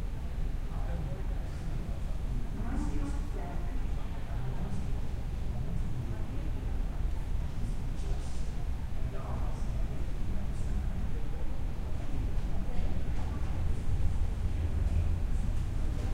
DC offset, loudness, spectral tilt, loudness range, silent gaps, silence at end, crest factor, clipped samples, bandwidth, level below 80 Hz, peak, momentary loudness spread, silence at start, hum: under 0.1%; -37 LUFS; -7 dB/octave; 3 LU; none; 0 s; 14 dB; under 0.1%; 10 kHz; -32 dBFS; -16 dBFS; 5 LU; 0 s; none